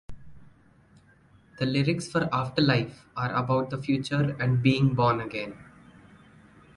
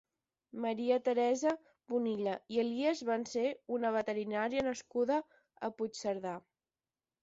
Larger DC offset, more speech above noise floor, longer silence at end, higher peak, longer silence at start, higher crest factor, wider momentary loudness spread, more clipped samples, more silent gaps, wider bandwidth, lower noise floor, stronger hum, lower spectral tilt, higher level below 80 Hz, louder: neither; second, 33 dB vs over 56 dB; first, 1.15 s vs 0.85 s; first, -8 dBFS vs -18 dBFS; second, 0.1 s vs 0.55 s; about the same, 20 dB vs 16 dB; about the same, 10 LU vs 9 LU; neither; neither; first, 11 kHz vs 7.6 kHz; second, -58 dBFS vs under -90 dBFS; neither; first, -7 dB/octave vs -3.5 dB/octave; first, -56 dBFS vs -74 dBFS; first, -26 LUFS vs -35 LUFS